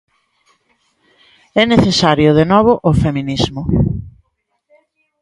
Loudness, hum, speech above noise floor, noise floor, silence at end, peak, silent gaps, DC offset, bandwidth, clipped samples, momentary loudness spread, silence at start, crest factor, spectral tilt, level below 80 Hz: -13 LUFS; none; 54 dB; -67 dBFS; 1.1 s; 0 dBFS; none; under 0.1%; 11.5 kHz; under 0.1%; 8 LU; 1.55 s; 16 dB; -6 dB/octave; -34 dBFS